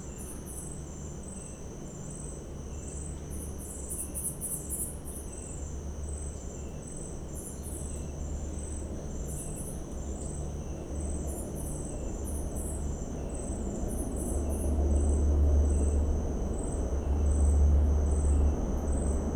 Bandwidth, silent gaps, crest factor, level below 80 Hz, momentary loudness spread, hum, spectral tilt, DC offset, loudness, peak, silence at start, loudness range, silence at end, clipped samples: 15.5 kHz; none; 16 dB; -34 dBFS; 14 LU; none; -6.5 dB/octave; under 0.1%; -33 LUFS; -16 dBFS; 0 s; 11 LU; 0 s; under 0.1%